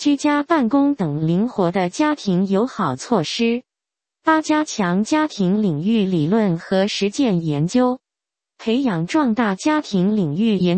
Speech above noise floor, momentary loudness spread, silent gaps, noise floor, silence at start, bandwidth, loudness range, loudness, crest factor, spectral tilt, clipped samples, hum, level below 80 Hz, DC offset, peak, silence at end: 69 dB; 3 LU; none; -87 dBFS; 0 s; 8.8 kHz; 1 LU; -19 LUFS; 18 dB; -6 dB/octave; under 0.1%; none; -58 dBFS; under 0.1%; -2 dBFS; 0 s